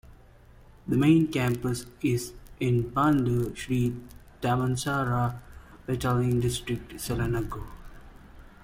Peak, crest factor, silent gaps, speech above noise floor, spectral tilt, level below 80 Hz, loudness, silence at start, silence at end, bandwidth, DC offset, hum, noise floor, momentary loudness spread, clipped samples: -10 dBFS; 18 dB; none; 26 dB; -6.5 dB/octave; -46 dBFS; -27 LUFS; 0.1 s; 0.15 s; 16.5 kHz; under 0.1%; none; -53 dBFS; 14 LU; under 0.1%